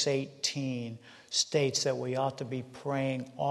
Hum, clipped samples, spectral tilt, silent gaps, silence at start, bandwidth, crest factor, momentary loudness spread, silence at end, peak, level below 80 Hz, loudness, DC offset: none; under 0.1%; -4 dB/octave; none; 0 s; 12.5 kHz; 18 dB; 10 LU; 0 s; -14 dBFS; -74 dBFS; -32 LUFS; under 0.1%